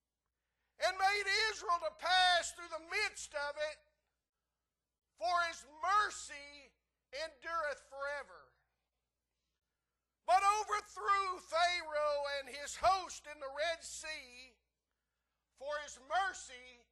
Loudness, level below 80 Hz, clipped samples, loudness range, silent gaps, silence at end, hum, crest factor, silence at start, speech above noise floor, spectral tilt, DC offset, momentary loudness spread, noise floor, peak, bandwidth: -36 LUFS; -70 dBFS; under 0.1%; 10 LU; 4.29-4.33 s; 0.2 s; none; 20 dB; 0.8 s; over 53 dB; 0 dB/octave; under 0.1%; 16 LU; under -90 dBFS; -20 dBFS; 12.5 kHz